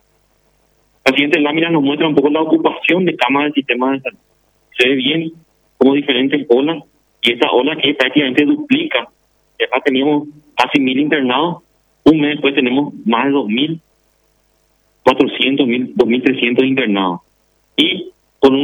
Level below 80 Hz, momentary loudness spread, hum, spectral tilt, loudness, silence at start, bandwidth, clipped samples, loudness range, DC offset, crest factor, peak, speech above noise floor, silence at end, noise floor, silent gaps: -56 dBFS; 8 LU; none; -6 dB/octave; -14 LUFS; 1.05 s; 10 kHz; under 0.1%; 2 LU; under 0.1%; 16 dB; 0 dBFS; 45 dB; 0 s; -59 dBFS; none